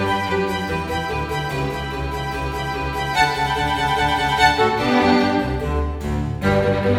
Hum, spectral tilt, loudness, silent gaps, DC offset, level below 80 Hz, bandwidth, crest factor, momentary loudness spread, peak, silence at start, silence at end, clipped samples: none; -5.5 dB/octave; -20 LUFS; none; under 0.1%; -32 dBFS; 16.5 kHz; 18 dB; 9 LU; -2 dBFS; 0 s; 0 s; under 0.1%